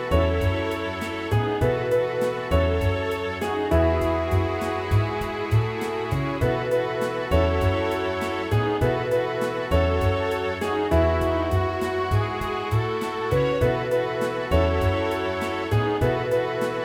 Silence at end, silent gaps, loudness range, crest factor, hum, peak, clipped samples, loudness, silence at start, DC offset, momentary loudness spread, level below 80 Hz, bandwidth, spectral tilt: 0 s; none; 1 LU; 16 dB; none; -8 dBFS; under 0.1%; -24 LUFS; 0 s; under 0.1%; 5 LU; -34 dBFS; 16.5 kHz; -7 dB/octave